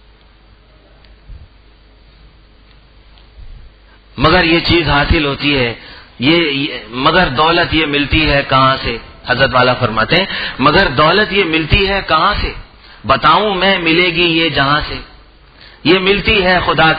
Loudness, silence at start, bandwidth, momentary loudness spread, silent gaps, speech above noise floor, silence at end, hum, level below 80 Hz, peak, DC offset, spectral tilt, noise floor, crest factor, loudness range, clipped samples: -12 LUFS; 1.3 s; 6 kHz; 8 LU; none; 32 dB; 0 s; none; -28 dBFS; 0 dBFS; under 0.1%; -7.5 dB/octave; -45 dBFS; 14 dB; 3 LU; under 0.1%